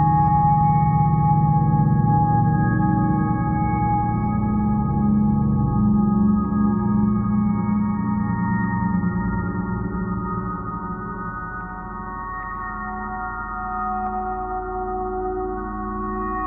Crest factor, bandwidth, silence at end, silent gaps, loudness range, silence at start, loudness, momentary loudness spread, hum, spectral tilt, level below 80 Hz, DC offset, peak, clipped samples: 14 dB; 2.4 kHz; 0 s; none; 10 LU; 0 s; -21 LUFS; 11 LU; none; -13 dB/octave; -34 dBFS; under 0.1%; -8 dBFS; under 0.1%